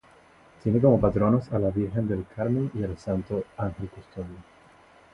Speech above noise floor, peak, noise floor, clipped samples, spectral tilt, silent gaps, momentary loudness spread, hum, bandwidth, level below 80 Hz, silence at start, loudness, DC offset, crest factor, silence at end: 30 dB; -6 dBFS; -55 dBFS; under 0.1%; -10.5 dB/octave; none; 18 LU; none; 7.8 kHz; -46 dBFS; 0.65 s; -26 LUFS; under 0.1%; 20 dB; 0.7 s